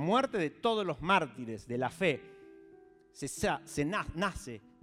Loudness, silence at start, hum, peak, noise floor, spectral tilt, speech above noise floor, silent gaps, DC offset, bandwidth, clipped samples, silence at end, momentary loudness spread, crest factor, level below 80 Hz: -33 LUFS; 0 s; none; -14 dBFS; -59 dBFS; -5 dB/octave; 26 dB; none; under 0.1%; 16 kHz; under 0.1%; 0.25 s; 14 LU; 20 dB; -56 dBFS